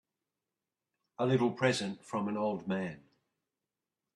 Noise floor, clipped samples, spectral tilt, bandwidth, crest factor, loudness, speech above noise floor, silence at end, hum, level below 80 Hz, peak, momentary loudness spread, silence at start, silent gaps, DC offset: under -90 dBFS; under 0.1%; -6 dB/octave; 12 kHz; 20 dB; -33 LUFS; over 58 dB; 1.15 s; none; -76 dBFS; -16 dBFS; 8 LU; 1.2 s; none; under 0.1%